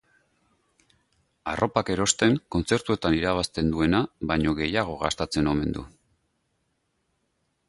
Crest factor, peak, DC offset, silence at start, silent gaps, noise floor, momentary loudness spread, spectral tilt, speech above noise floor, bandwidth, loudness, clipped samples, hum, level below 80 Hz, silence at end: 22 dB; -6 dBFS; under 0.1%; 1.45 s; none; -74 dBFS; 6 LU; -4.5 dB/octave; 49 dB; 11.5 kHz; -25 LUFS; under 0.1%; none; -44 dBFS; 1.8 s